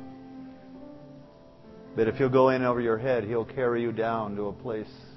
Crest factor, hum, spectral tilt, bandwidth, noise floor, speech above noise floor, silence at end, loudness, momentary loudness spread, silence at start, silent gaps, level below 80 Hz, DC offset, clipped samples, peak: 20 dB; none; -9 dB/octave; 6 kHz; -51 dBFS; 25 dB; 0 s; -27 LUFS; 24 LU; 0 s; none; -58 dBFS; under 0.1%; under 0.1%; -8 dBFS